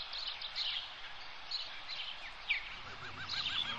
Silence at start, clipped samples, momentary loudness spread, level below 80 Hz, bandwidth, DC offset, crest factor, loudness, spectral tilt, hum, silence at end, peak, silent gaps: 0 s; under 0.1%; 10 LU; -62 dBFS; 9.6 kHz; 0.2%; 20 dB; -39 LUFS; -1 dB/octave; none; 0 s; -22 dBFS; none